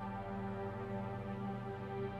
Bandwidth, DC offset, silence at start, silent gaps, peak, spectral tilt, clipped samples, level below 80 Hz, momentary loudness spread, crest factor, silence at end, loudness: 8.4 kHz; under 0.1%; 0 s; none; -30 dBFS; -9 dB/octave; under 0.1%; -60 dBFS; 1 LU; 12 dB; 0 s; -43 LUFS